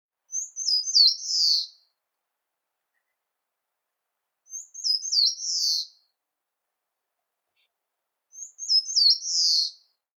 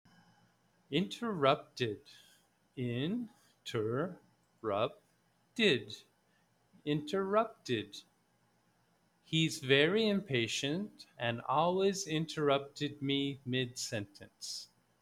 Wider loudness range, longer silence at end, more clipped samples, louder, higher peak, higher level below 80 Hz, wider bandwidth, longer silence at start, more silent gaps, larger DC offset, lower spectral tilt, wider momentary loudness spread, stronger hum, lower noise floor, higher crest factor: about the same, 9 LU vs 7 LU; about the same, 0.45 s vs 0.35 s; neither; first, -21 LUFS vs -34 LUFS; first, -8 dBFS vs -14 dBFS; second, under -90 dBFS vs -74 dBFS; first, 17.5 kHz vs 15.5 kHz; second, 0.3 s vs 0.9 s; neither; neither; second, 10.5 dB/octave vs -4.5 dB/octave; first, 21 LU vs 16 LU; neither; first, -84 dBFS vs -73 dBFS; about the same, 20 dB vs 22 dB